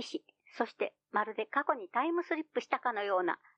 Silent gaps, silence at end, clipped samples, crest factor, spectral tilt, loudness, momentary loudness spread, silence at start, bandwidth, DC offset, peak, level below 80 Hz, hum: none; 0.25 s; under 0.1%; 22 dB; -4 dB/octave; -34 LUFS; 6 LU; 0 s; 9 kHz; under 0.1%; -14 dBFS; under -90 dBFS; none